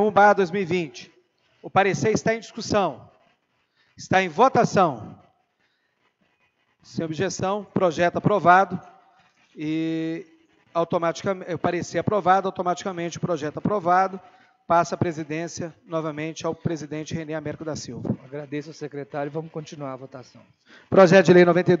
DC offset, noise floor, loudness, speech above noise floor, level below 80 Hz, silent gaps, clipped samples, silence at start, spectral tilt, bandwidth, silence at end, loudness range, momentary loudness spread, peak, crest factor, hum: under 0.1%; -70 dBFS; -22 LUFS; 47 dB; -62 dBFS; none; under 0.1%; 0 s; -6 dB/octave; 7.8 kHz; 0 s; 8 LU; 18 LU; -2 dBFS; 22 dB; none